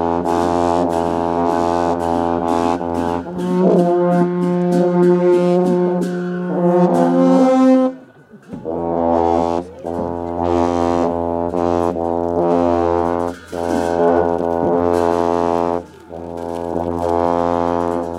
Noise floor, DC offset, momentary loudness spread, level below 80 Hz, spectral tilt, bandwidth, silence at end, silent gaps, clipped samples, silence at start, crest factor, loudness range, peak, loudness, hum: -42 dBFS; under 0.1%; 10 LU; -44 dBFS; -8 dB/octave; 12 kHz; 0 s; none; under 0.1%; 0 s; 16 dB; 4 LU; 0 dBFS; -17 LUFS; none